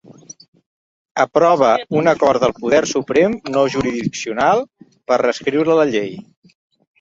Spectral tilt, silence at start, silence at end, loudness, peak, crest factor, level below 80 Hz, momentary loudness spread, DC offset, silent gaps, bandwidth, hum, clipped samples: -5 dB/octave; 0.1 s; 0.8 s; -16 LUFS; 0 dBFS; 18 dB; -52 dBFS; 8 LU; under 0.1%; 0.48-0.53 s, 0.66-1.05 s, 1.11-1.15 s; 7.8 kHz; none; under 0.1%